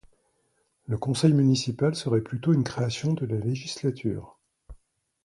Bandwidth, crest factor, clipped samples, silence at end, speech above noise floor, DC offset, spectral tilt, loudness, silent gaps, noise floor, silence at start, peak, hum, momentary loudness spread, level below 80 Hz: 11.5 kHz; 20 dB; under 0.1%; 0.5 s; 46 dB; under 0.1%; -6.5 dB/octave; -26 LUFS; none; -71 dBFS; 0.9 s; -8 dBFS; none; 10 LU; -56 dBFS